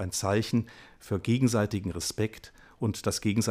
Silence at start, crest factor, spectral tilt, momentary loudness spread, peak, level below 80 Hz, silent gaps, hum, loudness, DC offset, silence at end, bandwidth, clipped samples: 0 s; 18 dB; -5 dB/octave; 9 LU; -12 dBFS; -54 dBFS; none; none; -29 LUFS; under 0.1%; 0 s; 15.5 kHz; under 0.1%